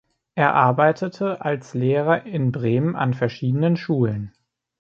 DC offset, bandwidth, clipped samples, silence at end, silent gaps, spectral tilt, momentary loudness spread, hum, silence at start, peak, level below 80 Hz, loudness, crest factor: under 0.1%; 7.2 kHz; under 0.1%; 0.55 s; none; -8.5 dB/octave; 8 LU; none; 0.35 s; -2 dBFS; -60 dBFS; -21 LUFS; 18 dB